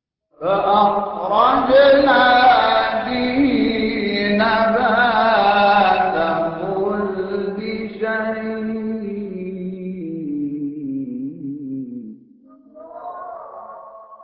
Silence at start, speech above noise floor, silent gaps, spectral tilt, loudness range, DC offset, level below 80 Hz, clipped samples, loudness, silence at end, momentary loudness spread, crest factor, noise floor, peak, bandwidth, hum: 0.4 s; 34 dB; none; -10 dB/octave; 14 LU; under 0.1%; -50 dBFS; under 0.1%; -17 LUFS; 0 s; 17 LU; 16 dB; -48 dBFS; -4 dBFS; 5.8 kHz; none